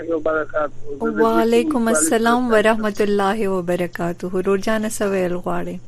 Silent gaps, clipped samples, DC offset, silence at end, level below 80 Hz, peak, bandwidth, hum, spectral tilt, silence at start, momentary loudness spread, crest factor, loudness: none; under 0.1%; under 0.1%; 0 s; -40 dBFS; -4 dBFS; 14.5 kHz; none; -4.5 dB/octave; 0 s; 9 LU; 16 dB; -19 LUFS